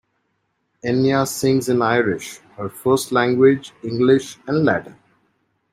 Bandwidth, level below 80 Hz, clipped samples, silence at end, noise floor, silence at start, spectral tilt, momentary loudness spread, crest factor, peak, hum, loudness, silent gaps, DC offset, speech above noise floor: 16 kHz; -58 dBFS; under 0.1%; 0.8 s; -70 dBFS; 0.85 s; -5.5 dB/octave; 13 LU; 18 dB; -2 dBFS; none; -19 LUFS; none; under 0.1%; 52 dB